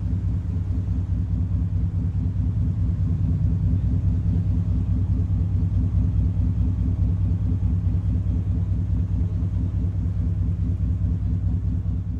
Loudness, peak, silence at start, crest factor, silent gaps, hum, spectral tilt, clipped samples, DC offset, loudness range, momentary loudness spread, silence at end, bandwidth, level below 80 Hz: -24 LUFS; -12 dBFS; 0 s; 10 dB; none; none; -11 dB/octave; under 0.1%; under 0.1%; 2 LU; 3 LU; 0 s; 2.6 kHz; -28 dBFS